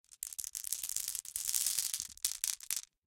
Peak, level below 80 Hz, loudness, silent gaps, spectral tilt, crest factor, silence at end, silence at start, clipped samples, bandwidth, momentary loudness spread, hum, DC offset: -8 dBFS; -72 dBFS; -35 LUFS; none; 3.5 dB/octave; 30 dB; 0.25 s; 0.1 s; under 0.1%; 17 kHz; 8 LU; none; under 0.1%